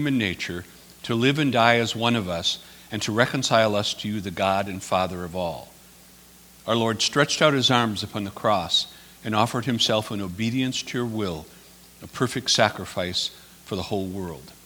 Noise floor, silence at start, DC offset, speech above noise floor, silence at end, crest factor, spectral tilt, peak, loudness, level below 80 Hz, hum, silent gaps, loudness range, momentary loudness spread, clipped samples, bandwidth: -50 dBFS; 0 s; under 0.1%; 26 dB; 0.15 s; 24 dB; -4 dB/octave; 0 dBFS; -23 LUFS; -56 dBFS; none; none; 4 LU; 13 LU; under 0.1%; over 20 kHz